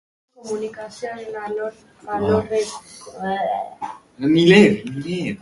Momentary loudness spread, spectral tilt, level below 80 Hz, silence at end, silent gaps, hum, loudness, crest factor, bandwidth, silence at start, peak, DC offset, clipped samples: 19 LU; -6 dB/octave; -54 dBFS; 0.05 s; none; none; -20 LUFS; 20 dB; 11.5 kHz; 0.45 s; 0 dBFS; under 0.1%; under 0.1%